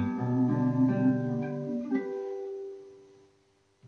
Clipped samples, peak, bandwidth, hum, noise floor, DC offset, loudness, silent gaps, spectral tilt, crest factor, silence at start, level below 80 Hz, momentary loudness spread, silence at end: under 0.1%; -16 dBFS; 6.4 kHz; 50 Hz at -65 dBFS; -68 dBFS; under 0.1%; -29 LUFS; none; -10.5 dB/octave; 14 dB; 0 s; -68 dBFS; 14 LU; 0 s